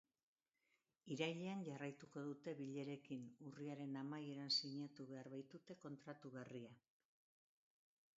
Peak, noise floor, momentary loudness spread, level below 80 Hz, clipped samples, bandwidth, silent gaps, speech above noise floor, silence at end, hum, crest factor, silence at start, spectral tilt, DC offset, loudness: -28 dBFS; -87 dBFS; 15 LU; under -90 dBFS; under 0.1%; 7.6 kHz; none; 37 dB; 1.4 s; none; 24 dB; 1.05 s; -4 dB/octave; under 0.1%; -50 LUFS